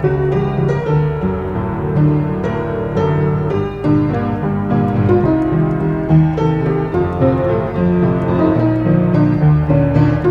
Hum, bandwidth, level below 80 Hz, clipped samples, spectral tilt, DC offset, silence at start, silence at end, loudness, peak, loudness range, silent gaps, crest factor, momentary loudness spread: none; 5 kHz; -32 dBFS; under 0.1%; -10.5 dB/octave; under 0.1%; 0 s; 0 s; -15 LUFS; 0 dBFS; 3 LU; none; 14 dB; 6 LU